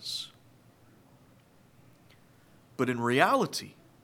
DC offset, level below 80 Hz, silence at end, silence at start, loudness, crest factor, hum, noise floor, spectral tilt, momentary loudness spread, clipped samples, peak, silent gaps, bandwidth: under 0.1%; -76 dBFS; 0.35 s; 0 s; -28 LUFS; 28 dB; none; -60 dBFS; -4.5 dB/octave; 22 LU; under 0.1%; -6 dBFS; none; 17.5 kHz